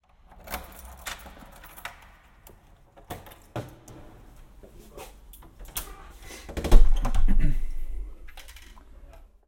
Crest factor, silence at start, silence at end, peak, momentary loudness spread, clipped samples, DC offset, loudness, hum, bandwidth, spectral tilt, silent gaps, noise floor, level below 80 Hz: 24 dB; 0.5 s; 1.1 s; 0 dBFS; 25 LU; under 0.1%; under 0.1%; -32 LUFS; none; 17 kHz; -5 dB/octave; none; -54 dBFS; -26 dBFS